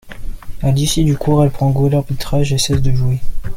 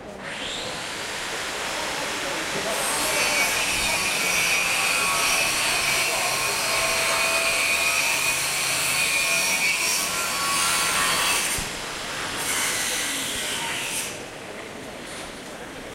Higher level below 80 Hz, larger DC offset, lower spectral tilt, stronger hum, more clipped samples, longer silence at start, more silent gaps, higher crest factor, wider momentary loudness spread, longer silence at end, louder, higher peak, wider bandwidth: first, -26 dBFS vs -50 dBFS; neither; first, -6 dB/octave vs 0 dB/octave; neither; neither; about the same, 0.05 s vs 0 s; neither; about the same, 12 dB vs 16 dB; second, 9 LU vs 13 LU; about the same, 0 s vs 0 s; first, -16 LUFS vs -22 LUFS; first, -2 dBFS vs -10 dBFS; about the same, 16 kHz vs 16 kHz